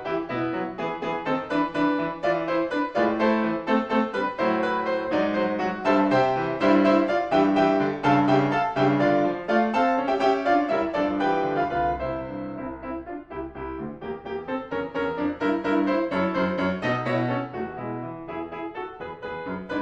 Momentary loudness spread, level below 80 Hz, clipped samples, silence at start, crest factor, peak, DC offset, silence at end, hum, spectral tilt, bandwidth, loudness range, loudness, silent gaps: 13 LU; -52 dBFS; under 0.1%; 0 s; 16 dB; -8 dBFS; under 0.1%; 0 s; none; -7 dB/octave; 7.8 kHz; 8 LU; -24 LUFS; none